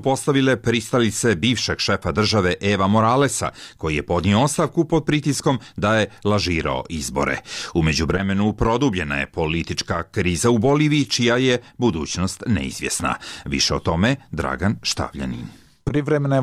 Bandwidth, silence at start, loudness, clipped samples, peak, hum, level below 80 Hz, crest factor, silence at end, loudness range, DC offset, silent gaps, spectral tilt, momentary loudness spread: 15.5 kHz; 0 s; -20 LUFS; under 0.1%; -8 dBFS; none; -40 dBFS; 12 dB; 0 s; 3 LU; under 0.1%; none; -5 dB/octave; 8 LU